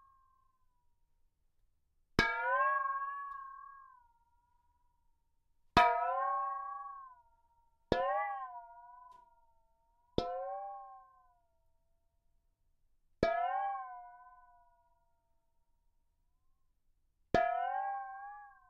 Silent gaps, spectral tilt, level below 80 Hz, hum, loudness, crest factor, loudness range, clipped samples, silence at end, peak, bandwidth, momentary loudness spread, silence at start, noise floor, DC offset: none; -2.5 dB/octave; -60 dBFS; none; -35 LUFS; 28 dB; 10 LU; under 0.1%; 0.2 s; -12 dBFS; 7 kHz; 21 LU; 2.2 s; -75 dBFS; under 0.1%